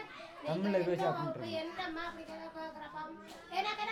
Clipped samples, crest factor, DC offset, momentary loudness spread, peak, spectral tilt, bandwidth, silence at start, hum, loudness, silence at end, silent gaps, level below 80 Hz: under 0.1%; 16 dB; under 0.1%; 13 LU; -22 dBFS; -6 dB/octave; 15.5 kHz; 0 s; none; -38 LUFS; 0 s; none; -70 dBFS